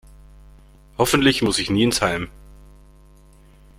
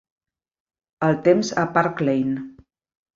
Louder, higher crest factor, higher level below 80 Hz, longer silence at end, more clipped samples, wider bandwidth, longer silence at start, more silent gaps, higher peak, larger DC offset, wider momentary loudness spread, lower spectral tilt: about the same, -19 LUFS vs -21 LUFS; about the same, 22 dB vs 20 dB; first, -44 dBFS vs -60 dBFS; first, 1.5 s vs 0.65 s; neither; first, 16.5 kHz vs 7.8 kHz; about the same, 1 s vs 1 s; neither; about the same, -2 dBFS vs -2 dBFS; neither; first, 14 LU vs 9 LU; second, -4 dB/octave vs -6 dB/octave